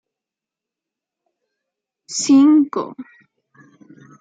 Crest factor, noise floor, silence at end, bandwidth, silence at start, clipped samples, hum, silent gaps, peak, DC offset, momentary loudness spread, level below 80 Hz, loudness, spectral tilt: 16 dB; -87 dBFS; 1.2 s; 9.2 kHz; 2.1 s; under 0.1%; none; none; -4 dBFS; under 0.1%; 20 LU; -74 dBFS; -15 LUFS; -3.5 dB/octave